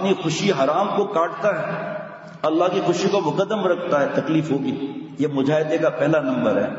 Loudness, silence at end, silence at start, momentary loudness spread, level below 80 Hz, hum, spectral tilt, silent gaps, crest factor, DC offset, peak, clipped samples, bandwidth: -21 LUFS; 0 s; 0 s; 7 LU; -68 dBFS; none; -6 dB/octave; none; 16 dB; under 0.1%; -6 dBFS; under 0.1%; 8 kHz